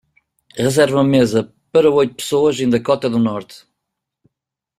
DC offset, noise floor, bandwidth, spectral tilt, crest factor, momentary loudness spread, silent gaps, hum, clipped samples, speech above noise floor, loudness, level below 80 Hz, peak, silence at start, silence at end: under 0.1%; -83 dBFS; 15 kHz; -5.5 dB/octave; 16 dB; 7 LU; none; none; under 0.1%; 67 dB; -16 LUFS; -54 dBFS; -2 dBFS; 0.55 s; 1.2 s